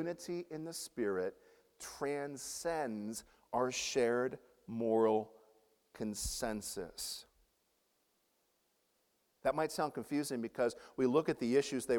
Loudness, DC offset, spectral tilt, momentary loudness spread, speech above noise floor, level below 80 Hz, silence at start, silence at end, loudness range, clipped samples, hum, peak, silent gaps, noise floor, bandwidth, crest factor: -37 LUFS; under 0.1%; -4 dB/octave; 11 LU; 42 dB; -62 dBFS; 0 s; 0 s; 8 LU; under 0.1%; none; -18 dBFS; none; -78 dBFS; 18.5 kHz; 20 dB